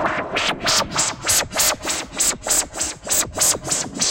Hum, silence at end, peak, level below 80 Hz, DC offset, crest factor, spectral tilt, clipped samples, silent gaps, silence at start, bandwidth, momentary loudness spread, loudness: none; 0 s; -6 dBFS; -44 dBFS; under 0.1%; 16 dB; -0.5 dB/octave; under 0.1%; none; 0 s; 17 kHz; 6 LU; -19 LUFS